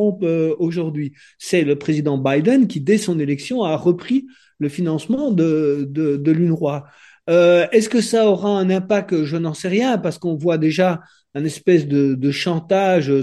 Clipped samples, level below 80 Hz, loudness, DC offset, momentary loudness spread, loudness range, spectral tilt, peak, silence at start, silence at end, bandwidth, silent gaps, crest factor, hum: under 0.1%; -64 dBFS; -18 LUFS; under 0.1%; 8 LU; 3 LU; -6.5 dB/octave; -2 dBFS; 0 s; 0 s; 12.5 kHz; none; 16 dB; none